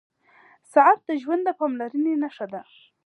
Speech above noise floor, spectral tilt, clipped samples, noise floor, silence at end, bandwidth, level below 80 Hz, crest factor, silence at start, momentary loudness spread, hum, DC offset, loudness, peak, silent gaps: 34 dB; -6 dB/octave; under 0.1%; -56 dBFS; 0.45 s; 11.5 kHz; -84 dBFS; 20 dB; 0.75 s; 17 LU; none; under 0.1%; -22 LUFS; -4 dBFS; none